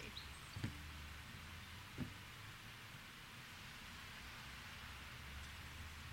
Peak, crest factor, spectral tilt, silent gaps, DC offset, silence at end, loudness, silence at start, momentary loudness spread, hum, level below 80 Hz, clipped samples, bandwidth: -28 dBFS; 26 dB; -3.5 dB/octave; none; under 0.1%; 0 s; -52 LUFS; 0 s; 5 LU; none; -60 dBFS; under 0.1%; 16 kHz